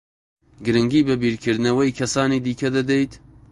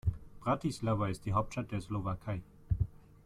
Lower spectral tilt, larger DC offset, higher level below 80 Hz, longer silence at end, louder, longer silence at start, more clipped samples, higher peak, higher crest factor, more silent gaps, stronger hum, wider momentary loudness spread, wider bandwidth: second, -5.5 dB/octave vs -7.5 dB/octave; neither; about the same, -50 dBFS vs -46 dBFS; about the same, 0.35 s vs 0.3 s; first, -20 LUFS vs -36 LUFS; first, 0.6 s vs 0.05 s; neither; first, -4 dBFS vs -18 dBFS; about the same, 16 dB vs 16 dB; neither; neither; about the same, 4 LU vs 6 LU; second, 11.5 kHz vs 13 kHz